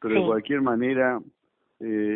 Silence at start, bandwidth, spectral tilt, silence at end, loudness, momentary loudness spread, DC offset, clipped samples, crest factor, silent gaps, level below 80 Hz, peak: 0 s; 4 kHz; -10.5 dB/octave; 0 s; -25 LUFS; 10 LU; under 0.1%; under 0.1%; 16 dB; none; -64 dBFS; -10 dBFS